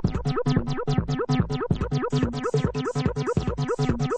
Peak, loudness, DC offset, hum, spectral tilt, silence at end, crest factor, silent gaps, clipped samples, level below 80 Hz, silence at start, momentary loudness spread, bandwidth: -8 dBFS; -26 LUFS; under 0.1%; none; -7.5 dB/octave; 0 s; 16 dB; none; under 0.1%; -38 dBFS; 0 s; 2 LU; 9 kHz